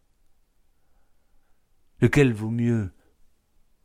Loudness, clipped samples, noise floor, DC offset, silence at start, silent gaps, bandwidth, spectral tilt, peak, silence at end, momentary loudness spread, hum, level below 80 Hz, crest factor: -23 LUFS; under 0.1%; -62 dBFS; under 0.1%; 2 s; none; 14 kHz; -7.5 dB/octave; -6 dBFS; 0.95 s; 9 LU; none; -50 dBFS; 22 dB